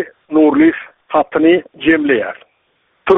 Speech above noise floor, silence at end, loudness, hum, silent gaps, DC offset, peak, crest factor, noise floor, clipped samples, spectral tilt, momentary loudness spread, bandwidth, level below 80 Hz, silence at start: 48 dB; 0 s; -13 LUFS; none; none; under 0.1%; 0 dBFS; 14 dB; -61 dBFS; under 0.1%; -3.5 dB/octave; 15 LU; 3.9 kHz; -50 dBFS; 0 s